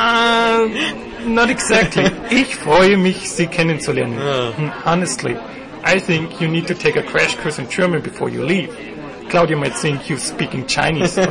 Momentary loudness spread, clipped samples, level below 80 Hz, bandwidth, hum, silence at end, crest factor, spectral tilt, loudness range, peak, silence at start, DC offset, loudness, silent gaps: 9 LU; under 0.1%; -44 dBFS; 11 kHz; none; 0 s; 14 dB; -4.5 dB/octave; 4 LU; -4 dBFS; 0 s; 0.2%; -17 LUFS; none